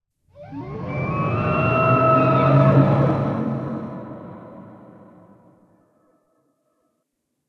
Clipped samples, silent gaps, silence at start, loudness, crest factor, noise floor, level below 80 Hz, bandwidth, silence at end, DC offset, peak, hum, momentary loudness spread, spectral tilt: under 0.1%; none; 0.4 s; -19 LUFS; 20 dB; -76 dBFS; -50 dBFS; 5.2 kHz; 2.75 s; under 0.1%; -2 dBFS; none; 22 LU; -10 dB/octave